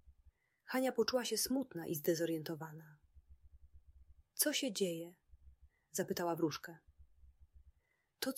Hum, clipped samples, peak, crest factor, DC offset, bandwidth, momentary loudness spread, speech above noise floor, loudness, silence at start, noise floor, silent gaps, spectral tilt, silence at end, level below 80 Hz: none; under 0.1%; -18 dBFS; 22 dB; under 0.1%; 16 kHz; 14 LU; 41 dB; -38 LUFS; 0.05 s; -80 dBFS; none; -3.5 dB/octave; 0 s; -68 dBFS